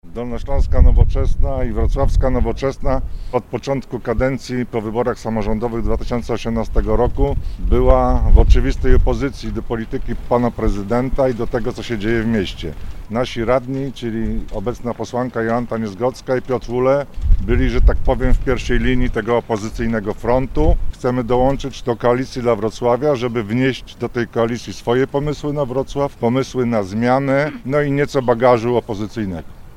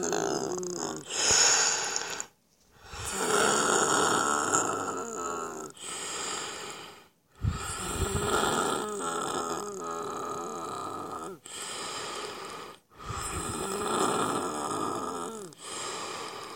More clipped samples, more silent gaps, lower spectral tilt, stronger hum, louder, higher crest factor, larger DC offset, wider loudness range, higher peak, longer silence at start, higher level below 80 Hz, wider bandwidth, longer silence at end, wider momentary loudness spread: neither; neither; first, -7 dB/octave vs -2 dB/octave; neither; first, -19 LUFS vs -29 LUFS; second, 16 dB vs 24 dB; neither; second, 4 LU vs 10 LU; first, 0 dBFS vs -8 dBFS; about the same, 0.05 s vs 0 s; first, -20 dBFS vs -50 dBFS; second, 9.4 kHz vs 16.5 kHz; about the same, 0 s vs 0 s; second, 8 LU vs 15 LU